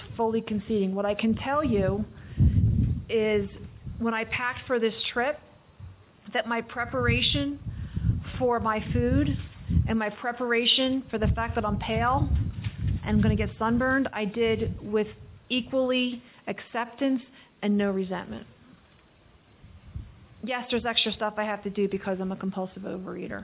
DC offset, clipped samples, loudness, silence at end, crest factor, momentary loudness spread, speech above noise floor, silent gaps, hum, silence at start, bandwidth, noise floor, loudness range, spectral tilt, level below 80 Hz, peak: under 0.1%; under 0.1%; -27 LUFS; 0 s; 18 dB; 11 LU; 31 dB; none; none; 0 s; 4 kHz; -58 dBFS; 6 LU; -10 dB/octave; -38 dBFS; -10 dBFS